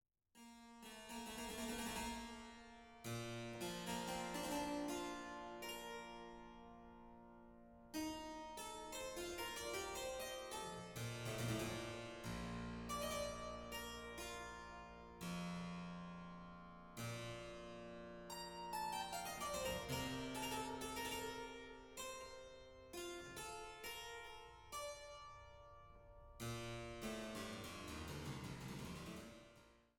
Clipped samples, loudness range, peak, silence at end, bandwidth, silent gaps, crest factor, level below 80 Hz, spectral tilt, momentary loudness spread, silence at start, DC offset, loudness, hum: under 0.1%; 6 LU; -32 dBFS; 0.15 s; 18 kHz; none; 18 dB; -64 dBFS; -4 dB/octave; 15 LU; 0.35 s; under 0.1%; -49 LUFS; none